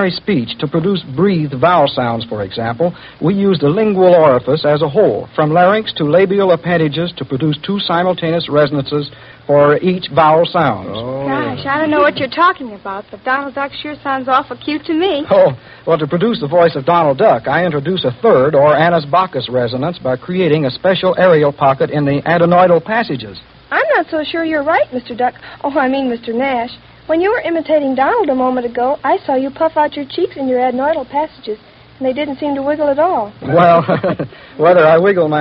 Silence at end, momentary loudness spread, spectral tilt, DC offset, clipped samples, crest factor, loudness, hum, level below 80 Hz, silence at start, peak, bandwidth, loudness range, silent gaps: 0 s; 10 LU; -4.5 dB/octave; under 0.1%; under 0.1%; 14 dB; -14 LUFS; none; -50 dBFS; 0 s; 0 dBFS; 5.6 kHz; 4 LU; none